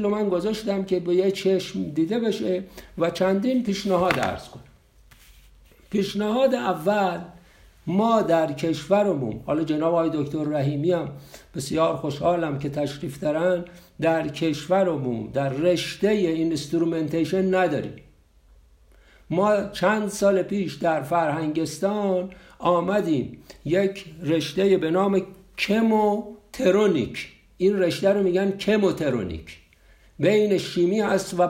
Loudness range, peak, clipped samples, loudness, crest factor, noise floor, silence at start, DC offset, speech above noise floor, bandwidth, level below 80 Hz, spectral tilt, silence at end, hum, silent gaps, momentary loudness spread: 3 LU; -4 dBFS; under 0.1%; -23 LUFS; 20 dB; -55 dBFS; 0 s; under 0.1%; 32 dB; 16 kHz; -54 dBFS; -6 dB/octave; 0 s; none; none; 8 LU